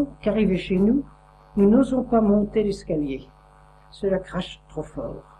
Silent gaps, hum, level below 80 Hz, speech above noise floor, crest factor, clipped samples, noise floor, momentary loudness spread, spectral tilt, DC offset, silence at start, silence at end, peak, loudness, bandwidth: none; none; -44 dBFS; 29 dB; 16 dB; under 0.1%; -51 dBFS; 16 LU; -8 dB/octave; under 0.1%; 0 s; 0.2 s; -8 dBFS; -22 LUFS; 9.8 kHz